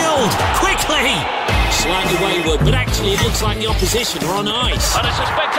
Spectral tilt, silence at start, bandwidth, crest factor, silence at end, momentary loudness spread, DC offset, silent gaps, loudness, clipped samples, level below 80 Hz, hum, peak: -3.5 dB/octave; 0 s; 16.5 kHz; 12 dB; 0 s; 3 LU; under 0.1%; none; -16 LUFS; under 0.1%; -24 dBFS; none; -4 dBFS